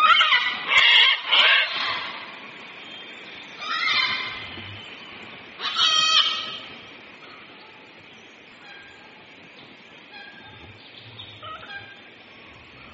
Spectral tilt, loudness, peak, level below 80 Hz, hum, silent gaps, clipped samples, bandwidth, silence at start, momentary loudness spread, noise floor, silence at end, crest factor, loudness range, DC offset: 3.5 dB/octave; -18 LUFS; -4 dBFS; -66 dBFS; none; none; under 0.1%; 8 kHz; 0 s; 27 LU; -47 dBFS; 0 s; 22 dB; 24 LU; under 0.1%